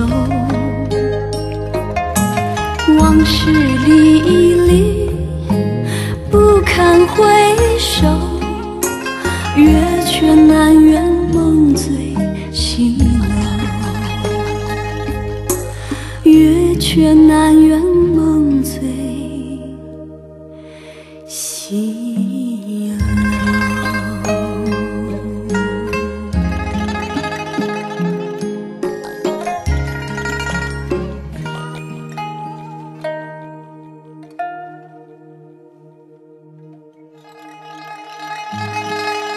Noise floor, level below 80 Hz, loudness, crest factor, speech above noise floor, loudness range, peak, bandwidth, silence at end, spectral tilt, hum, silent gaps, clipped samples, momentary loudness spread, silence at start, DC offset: -44 dBFS; -26 dBFS; -14 LUFS; 14 dB; 35 dB; 18 LU; 0 dBFS; 13 kHz; 0 s; -5.5 dB/octave; none; none; under 0.1%; 18 LU; 0 s; under 0.1%